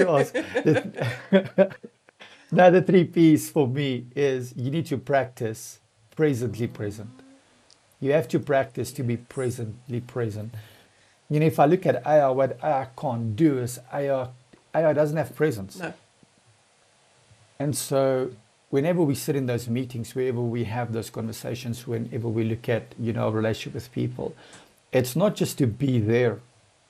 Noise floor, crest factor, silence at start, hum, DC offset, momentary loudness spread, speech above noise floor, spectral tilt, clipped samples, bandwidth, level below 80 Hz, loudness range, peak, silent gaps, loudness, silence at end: -61 dBFS; 20 dB; 0 s; none; under 0.1%; 13 LU; 37 dB; -6.5 dB/octave; under 0.1%; 15 kHz; -64 dBFS; 8 LU; -4 dBFS; none; -25 LUFS; 0.5 s